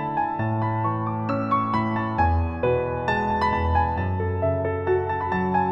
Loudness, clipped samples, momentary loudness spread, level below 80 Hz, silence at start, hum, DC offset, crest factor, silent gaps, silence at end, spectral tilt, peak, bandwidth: -24 LUFS; under 0.1%; 3 LU; -36 dBFS; 0 s; none; under 0.1%; 14 dB; none; 0 s; -9 dB/octave; -10 dBFS; 6.4 kHz